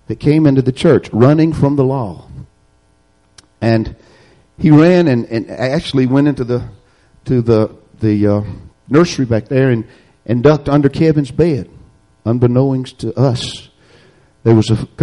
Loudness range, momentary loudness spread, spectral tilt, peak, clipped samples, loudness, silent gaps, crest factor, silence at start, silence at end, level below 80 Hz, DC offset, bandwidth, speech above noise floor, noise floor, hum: 3 LU; 13 LU; -8 dB/octave; 0 dBFS; under 0.1%; -14 LUFS; none; 14 dB; 0.1 s; 0 s; -40 dBFS; under 0.1%; 11 kHz; 42 dB; -55 dBFS; none